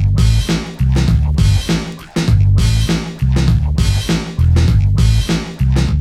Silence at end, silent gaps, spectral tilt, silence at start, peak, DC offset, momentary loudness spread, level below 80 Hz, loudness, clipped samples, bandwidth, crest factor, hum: 0 s; none; -6 dB/octave; 0 s; -2 dBFS; under 0.1%; 6 LU; -18 dBFS; -15 LUFS; under 0.1%; 13.5 kHz; 12 dB; none